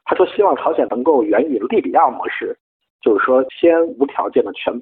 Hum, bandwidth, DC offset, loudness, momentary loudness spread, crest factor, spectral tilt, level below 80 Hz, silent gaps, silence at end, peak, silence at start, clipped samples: none; 4.1 kHz; under 0.1%; -16 LUFS; 9 LU; 14 dB; -9 dB/octave; -62 dBFS; 2.60-2.80 s, 2.90-2.99 s; 0 s; -2 dBFS; 0.05 s; under 0.1%